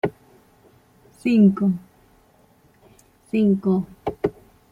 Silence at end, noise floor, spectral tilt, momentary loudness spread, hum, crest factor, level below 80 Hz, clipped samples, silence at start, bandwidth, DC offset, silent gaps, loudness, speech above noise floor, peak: 0.4 s; -57 dBFS; -9 dB/octave; 12 LU; none; 18 dB; -56 dBFS; under 0.1%; 0.05 s; 9.8 kHz; under 0.1%; none; -21 LUFS; 38 dB; -6 dBFS